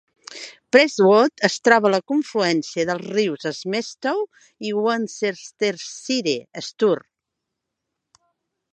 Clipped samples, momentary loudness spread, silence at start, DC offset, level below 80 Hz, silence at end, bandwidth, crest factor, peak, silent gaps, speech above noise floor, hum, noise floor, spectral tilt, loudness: under 0.1%; 16 LU; 0.3 s; under 0.1%; -72 dBFS; 1.75 s; 9 kHz; 22 dB; 0 dBFS; none; 61 dB; none; -82 dBFS; -4 dB/octave; -20 LUFS